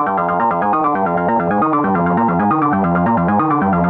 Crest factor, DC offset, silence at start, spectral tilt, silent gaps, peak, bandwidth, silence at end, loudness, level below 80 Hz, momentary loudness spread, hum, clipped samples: 10 dB; under 0.1%; 0 s; -11 dB/octave; none; -4 dBFS; 3.9 kHz; 0 s; -15 LUFS; -44 dBFS; 1 LU; none; under 0.1%